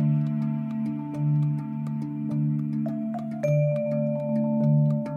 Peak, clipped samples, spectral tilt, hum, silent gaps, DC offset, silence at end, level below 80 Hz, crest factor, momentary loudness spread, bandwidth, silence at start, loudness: -12 dBFS; under 0.1%; -11 dB/octave; none; none; under 0.1%; 0 s; -68 dBFS; 12 dB; 8 LU; 6.4 kHz; 0 s; -26 LUFS